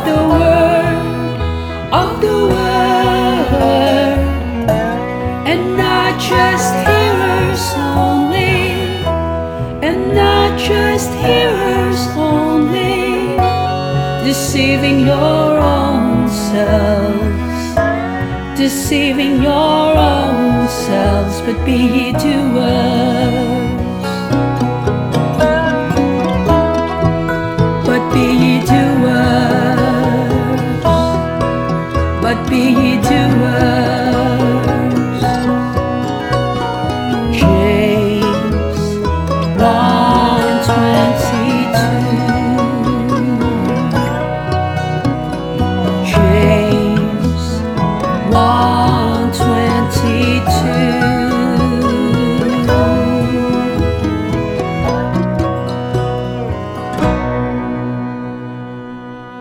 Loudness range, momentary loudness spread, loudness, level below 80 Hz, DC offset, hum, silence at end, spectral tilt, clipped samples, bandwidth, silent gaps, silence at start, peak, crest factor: 2 LU; 6 LU; -14 LUFS; -30 dBFS; under 0.1%; none; 0 s; -6 dB/octave; under 0.1%; 18.5 kHz; none; 0 s; 0 dBFS; 12 dB